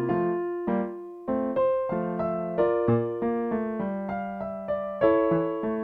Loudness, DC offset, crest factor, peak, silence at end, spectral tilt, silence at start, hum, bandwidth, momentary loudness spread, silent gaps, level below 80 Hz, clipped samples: -27 LUFS; under 0.1%; 18 dB; -10 dBFS; 0 s; -10.5 dB/octave; 0 s; none; 4.3 kHz; 9 LU; none; -58 dBFS; under 0.1%